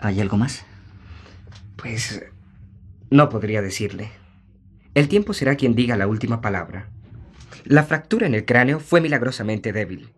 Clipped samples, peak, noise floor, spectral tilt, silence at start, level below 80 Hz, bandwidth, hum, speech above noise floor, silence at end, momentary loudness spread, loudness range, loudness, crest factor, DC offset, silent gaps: under 0.1%; -2 dBFS; -50 dBFS; -6.5 dB/octave; 0 s; -50 dBFS; 13 kHz; none; 31 dB; 0.1 s; 18 LU; 4 LU; -20 LUFS; 20 dB; under 0.1%; none